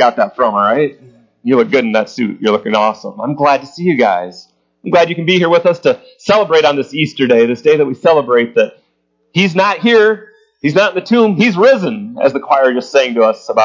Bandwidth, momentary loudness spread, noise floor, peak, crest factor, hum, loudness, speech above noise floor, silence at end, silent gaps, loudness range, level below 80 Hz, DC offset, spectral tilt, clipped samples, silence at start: 7.6 kHz; 9 LU; -62 dBFS; 0 dBFS; 12 dB; none; -12 LUFS; 50 dB; 0 s; none; 3 LU; -62 dBFS; under 0.1%; -6 dB/octave; under 0.1%; 0 s